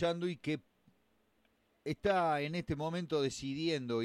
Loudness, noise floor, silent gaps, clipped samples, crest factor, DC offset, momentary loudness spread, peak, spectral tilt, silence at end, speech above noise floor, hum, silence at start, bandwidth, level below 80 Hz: -36 LUFS; -74 dBFS; none; under 0.1%; 18 dB; under 0.1%; 9 LU; -18 dBFS; -5.5 dB/octave; 0 s; 39 dB; none; 0 s; 13 kHz; -62 dBFS